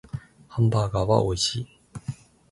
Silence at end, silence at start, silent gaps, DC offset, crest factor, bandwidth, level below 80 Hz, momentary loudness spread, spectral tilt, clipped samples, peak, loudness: 0.4 s; 0.15 s; none; under 0.1%; 20 dB; 11.5 kHz; -44 dBFS; 17 LU; -5.5 dB/octave; under 0.1%; -6 dBFS; -24 LUFS